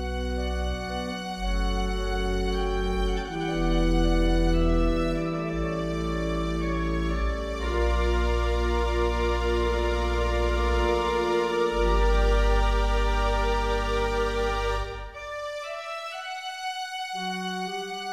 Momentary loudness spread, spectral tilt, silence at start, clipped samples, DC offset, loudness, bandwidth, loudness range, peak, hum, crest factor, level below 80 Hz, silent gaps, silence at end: 8 LU; -6 dB/octave; 0 s; under 0.1%; under 0.1%; -27 LUFS; 11 kHz; 5 LU; -10 dBFS; none; 14 dB; -28 dBFS; none; 0 s